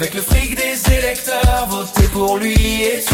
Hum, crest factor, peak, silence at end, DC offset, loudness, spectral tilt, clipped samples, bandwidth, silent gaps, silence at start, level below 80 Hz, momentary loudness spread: none; 14 dB; 0 dBFS; 0 s; under 0.1%; -16 LUFS; -4 dB/octave; under 0.1%; 17 kHz; none; 0 s; -20 dBFS; 3 LU